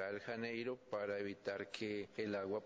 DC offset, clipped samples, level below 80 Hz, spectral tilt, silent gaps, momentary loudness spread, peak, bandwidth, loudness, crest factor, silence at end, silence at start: under 0.1%; under 0.1%; -78 dBFS; -5.5 dB/octave; none; 3 LU; -26 dBFS; 8 kHz; -44 LUFS; 18 dB; 0 s; 0 s